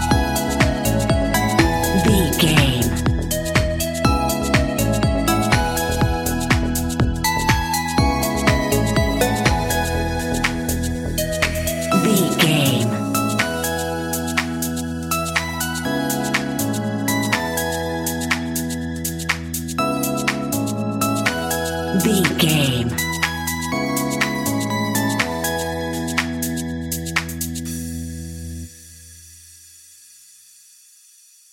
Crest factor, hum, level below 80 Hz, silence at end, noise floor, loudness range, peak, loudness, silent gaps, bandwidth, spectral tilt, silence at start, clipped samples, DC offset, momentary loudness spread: 20 dB; none; -30 dBFS; 1.95 s; -50 dBFS; 7 LU; 0 dBFS; -20 LUFS; none; 17 kHz; -4.5 dB/octave; 0 s; under 0.1%; under 0.1%; 8 LU